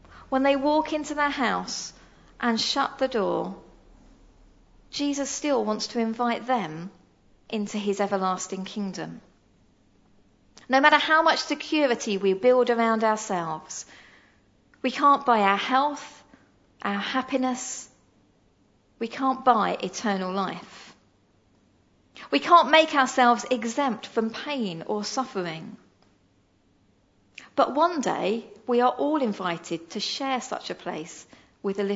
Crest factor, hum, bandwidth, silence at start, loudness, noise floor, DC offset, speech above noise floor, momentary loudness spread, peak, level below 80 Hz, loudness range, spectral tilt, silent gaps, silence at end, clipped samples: 24 dB; none; 8 kHz; 0.1 s; -25 LUFS; -64 dBFS; under 0.1%; 39 dB; 15 LU; -2 dBFS; -64 dBFS; 8 LU; -3.5 dB/octave; none; 0 s; under 0.1%